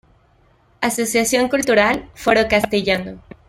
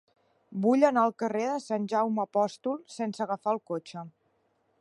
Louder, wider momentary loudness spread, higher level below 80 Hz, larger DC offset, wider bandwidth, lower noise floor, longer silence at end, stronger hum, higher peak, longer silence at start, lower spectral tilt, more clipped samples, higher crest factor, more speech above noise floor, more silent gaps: first, -17 LUFS vs -29 LUFS; second, 7 LU vs 14 LU; first, -46 dBFS vs -80 dBFS; neither; first, 16.5 kHz vs 11.5 kHz; second, -56 dBFS vs -72 dBFS; second, 0.3 s vs 0.7 s; neither; first, -2 dBFS vs -8 dBFS; first, 0.8 s vs 0.5 s; second, -3 dB/octave vs -6.5 dB/octave; neither; about the same, 18 dB vs 20 dB; second, 38 dB vs 44 dB; neither